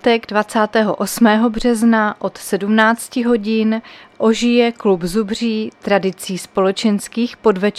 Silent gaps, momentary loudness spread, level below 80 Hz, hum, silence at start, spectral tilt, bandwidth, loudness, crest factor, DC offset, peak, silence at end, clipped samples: none; 8 LU; -46 dBFS; none; 0.05 s; -5 dB/octave; 14.5 kHz; -16 LUFS; 16 dB; under 0.1%; 0 dBFS; 0 s; under 0.1%